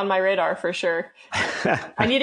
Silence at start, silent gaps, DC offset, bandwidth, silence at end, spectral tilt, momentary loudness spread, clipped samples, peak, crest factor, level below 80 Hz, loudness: 0 s; none; under 0.1%; 10 kHz; 0 s; -4.5 dB/octave; 5 LU; under 0.1%; -2 dBFS; 20 dB; -56 dBFS; -23 LUFS